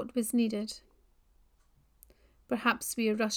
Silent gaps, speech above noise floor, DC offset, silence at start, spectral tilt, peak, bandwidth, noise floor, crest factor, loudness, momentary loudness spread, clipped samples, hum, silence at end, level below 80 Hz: none; 36 dB; under 0.1%; 0 s; -3.5 dB/octave; -12 dBFS; 18.5 kHz; -67 dBFS; 22 dB; -31 LUFS; 10 LU; under 0.1%; none; 0 s; -66 dBFS